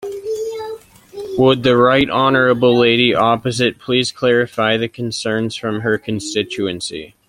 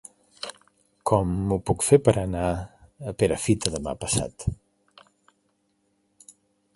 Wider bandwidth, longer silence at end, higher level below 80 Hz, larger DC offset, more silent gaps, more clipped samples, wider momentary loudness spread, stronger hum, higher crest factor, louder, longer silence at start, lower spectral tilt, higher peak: first, 15.5 kHz vs 11.5 kHz; second, 0.2 s vs 2.2 s; second, -50 dBFS vs -44 dBFS; neither; neither; neither; second, 13 LU vs 19 LU; neither; second, 16 dB vs 24 dB; first, -16 LUFS vs -24 LUFS; second, 0 s vs 0.45 s; about the same, -5 dB/octave vs -5 dB/octave; about the same, 0 dBFS vs -2 dBFS